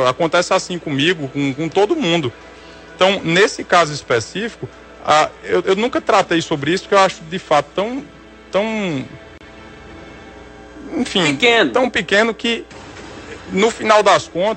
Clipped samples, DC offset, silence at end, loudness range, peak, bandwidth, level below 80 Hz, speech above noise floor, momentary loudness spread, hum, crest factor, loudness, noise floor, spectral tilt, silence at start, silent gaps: under 0.1%; under 0.1%; 0 s; 6 LU; 0 dBFS; 8.8 kHz; -50 dBFS; 22 dB; 20 LU; none; 18 dB; -16 LUFS; -38 dBFS; -4 dB/octave; 0 s; none